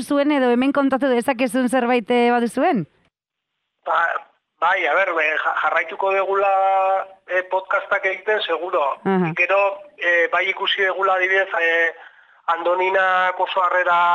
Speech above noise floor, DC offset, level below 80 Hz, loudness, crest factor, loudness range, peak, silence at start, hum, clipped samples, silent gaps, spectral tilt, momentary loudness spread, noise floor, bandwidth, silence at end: 62 dB; under 0.1%; -70 dBFS; -19 LUFS; 12 dB; 3 LU; -6 dBFS; 0 s; none; under 0.1%; none; -5 dB/octave; 6 LU; -81 dBFS; 13 kHz; 0 s